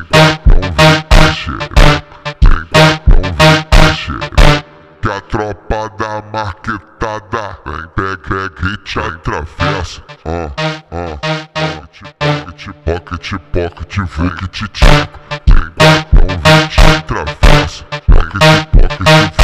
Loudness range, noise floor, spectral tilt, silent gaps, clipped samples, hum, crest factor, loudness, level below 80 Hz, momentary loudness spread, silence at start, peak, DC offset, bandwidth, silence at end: 10 LU; -29 dBFS; -5 dB/octave; none; under 0.1%; none; 10 dB; -12 LUFS; -14 dBFS; 13 LU; 0 s; 0 dBFS; under 0.1%; 15 kHz; 0 s